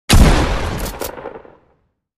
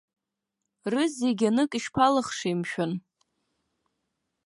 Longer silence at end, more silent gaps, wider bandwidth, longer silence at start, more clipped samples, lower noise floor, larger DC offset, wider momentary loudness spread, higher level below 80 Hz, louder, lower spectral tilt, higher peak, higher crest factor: second, 0.8 s vs 1.45 s; neither; first, 16 kHz vs 11.5 kHz; second, 0.1 s vs 0.85 s; neither; second, -62 dBFS vs -84 dBFS; neither; first, 20 LU vs 8 LU; first, -18 dBFS vs -66 dBFS; first, -17 LUFS vs -26 LUFS; about the same, -4.5 dB/octave vs -5 dB/octave; first, 0 dBFS vs -8 dBFS; about the same, 16 dB vs 20 dB